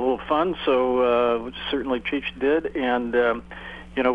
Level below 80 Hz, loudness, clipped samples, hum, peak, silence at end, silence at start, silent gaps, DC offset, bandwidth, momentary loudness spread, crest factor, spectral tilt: -48 dBFS; -23 LUFS; under 0.1%; none; -8 dBFS; 0 s; 0 s; none; under 0.1%; 5.2 kHz; 9 LU; 16 dB; -7 dB/octave